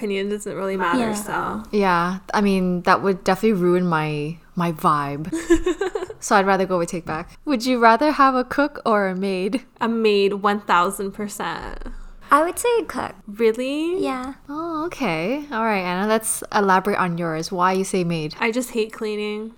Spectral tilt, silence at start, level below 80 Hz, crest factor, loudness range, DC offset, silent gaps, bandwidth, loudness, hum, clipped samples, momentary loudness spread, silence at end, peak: -5 dB/octave; 0 s; -44 dBFS; 20 dB; 4 LU; under 0.1%; none; over 20 kHz; -21 LUFS; none; under 0.1%; 11 LU; 0.05 s; 0 dBFS